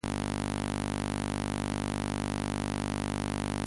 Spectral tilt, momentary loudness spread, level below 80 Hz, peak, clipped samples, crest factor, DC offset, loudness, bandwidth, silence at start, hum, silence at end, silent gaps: -5 dB/octave; 0 LU; -44 dBFS; -16 dBFS; under 0.1%; 16 dB; under 0.1%; -33 LUFS; 11.5 kHz; 0.05 s; none; 0 s; none